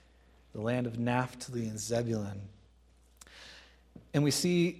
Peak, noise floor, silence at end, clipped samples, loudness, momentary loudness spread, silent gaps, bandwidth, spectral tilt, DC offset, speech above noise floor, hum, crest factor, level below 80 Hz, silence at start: -14 dBFS; -63 dBFS; 0 s; under 0.1%; -33 LUFS; 23 LU; none; 15.5 kHz; -5 dB/octave; under 0.1%; 31 dB; none; 20 dB; -62 dBFS; 0.55 s